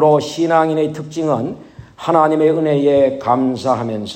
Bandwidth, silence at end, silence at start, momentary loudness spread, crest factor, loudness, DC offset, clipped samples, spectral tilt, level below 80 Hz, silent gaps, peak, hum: 14 kHz; 0 s; 0 s; 8 LU; 14 dB; -16 LUFS; under 0.1%; under 0.1%; -6.5 dB/octave; -54 dBFS; none; 0 dBFS; none